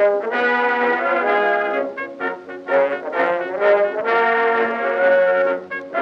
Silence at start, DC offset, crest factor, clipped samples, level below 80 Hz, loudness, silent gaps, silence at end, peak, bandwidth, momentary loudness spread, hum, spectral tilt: 0 s; under 0.1%; 14 dB; under 0.1%; -74 dBFS; -18 LUFS; none; 0 s; -4 dBFS; 6.4 kHz; 10 LU; none; -5.5 dB/octave